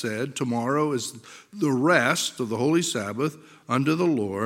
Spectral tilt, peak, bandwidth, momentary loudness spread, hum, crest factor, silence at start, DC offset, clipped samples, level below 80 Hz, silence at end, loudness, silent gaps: -4.5 dB/octave; -4 dBFS; 16.5 kHz; 10 LU; none; 22 dB; 0 s; under 0.1%; under 0.1%; -74 dBFS; 0 s; -24 LUFS; none